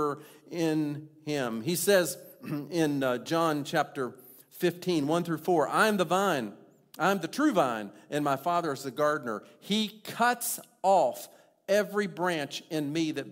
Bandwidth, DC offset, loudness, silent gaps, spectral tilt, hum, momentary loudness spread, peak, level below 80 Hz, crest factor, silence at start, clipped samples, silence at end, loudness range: 16 kHz; under 0.1%; -29 LUFS; none; -4.5 dB/octave; none; 13 LU; -10 dBFS; -76 dBFS; 20 dB; 0 s; under 0.1%; 0 s; 2 LU